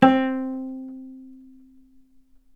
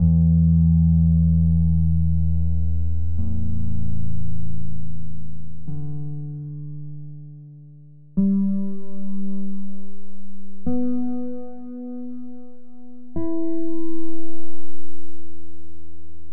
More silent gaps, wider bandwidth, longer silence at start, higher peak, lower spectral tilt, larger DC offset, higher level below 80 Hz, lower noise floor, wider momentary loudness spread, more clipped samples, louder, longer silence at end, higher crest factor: neither; first, 5 kHz vs 1.3 kHz; about the same, 0 s vs 0 s; first, 0 dBFS vs -6 dBFS; second, -7.5 dB/octave vs -16 dB/octave; second, under 0.1% vs 10%; second, -64 dBFS vs -32 dBFS; first, -57 dBFS vs -46 dBFS; about the same, 25 LU vs 25 LU; neither; about the same, -25 LUFS vs -24 LUFS; first, 1.2 s vs 0 s; first, 24 dB vs 10 dB